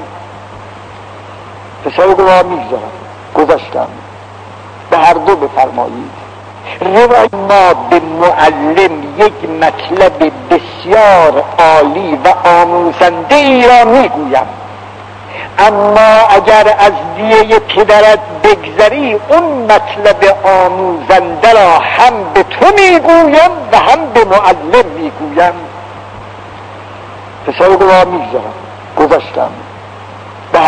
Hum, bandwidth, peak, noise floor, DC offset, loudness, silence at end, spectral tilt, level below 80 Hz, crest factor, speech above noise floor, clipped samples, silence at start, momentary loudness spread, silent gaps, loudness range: none; 11 kHz; 0 dBFS; -29 dBFS; under 0.1%; -7 LUFS; 0 s; -5 dB/octave; -40 dBFS; 8 dB; 22 dB; 7%; 0 s; 23 LU; none; 6 LU